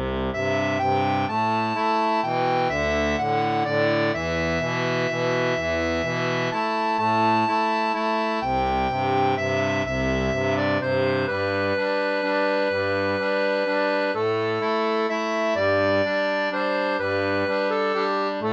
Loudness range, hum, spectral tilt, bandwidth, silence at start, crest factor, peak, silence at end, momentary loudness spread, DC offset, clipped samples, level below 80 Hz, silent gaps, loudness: 1 LU; none; -5.5 dB/octave; 8.4 kHz; 0 s; 14 dB; -10 dBFS; 0 s; 2 LU; under 0.1%; under 0.1%; -44 dBFS; none; -23 LUFS